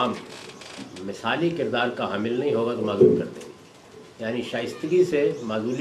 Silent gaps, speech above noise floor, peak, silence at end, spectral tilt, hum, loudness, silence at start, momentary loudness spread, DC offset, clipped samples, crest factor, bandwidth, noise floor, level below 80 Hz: none; 23 dB; -4 dBFS; 0 s; -6 dB/octave; none; -24 LUFS; 0 s; 20 LU; under 0.1%; under 0.1%; 20 dB; 12.5 kHz; -47 dBFS; -60 dBFS